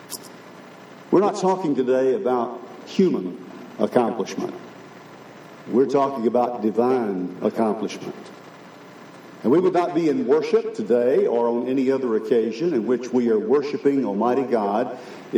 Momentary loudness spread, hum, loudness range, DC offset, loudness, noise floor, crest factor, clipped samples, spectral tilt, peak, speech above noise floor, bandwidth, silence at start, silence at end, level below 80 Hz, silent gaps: 22 LU; none; 4 LU; under 0.1%; -22 LUFS; -43 dBFS; 18 dB; under 0.1%; -6.5 dB/octave; -4 dBFS; 22 dB; 15 kHz; 0 s; 0 s; -82 dBFS; none